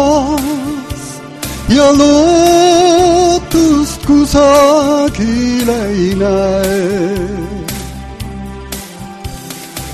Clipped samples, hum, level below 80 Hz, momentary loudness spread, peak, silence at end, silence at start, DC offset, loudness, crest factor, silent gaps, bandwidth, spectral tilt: under 0.1%; none; -30 dBFS; 18 LU; 0 dBFS; 0 s; 0 s; under 0.1%; -10 LUFS; 12 dB; none; 13.5 kHz; -5 dB/octave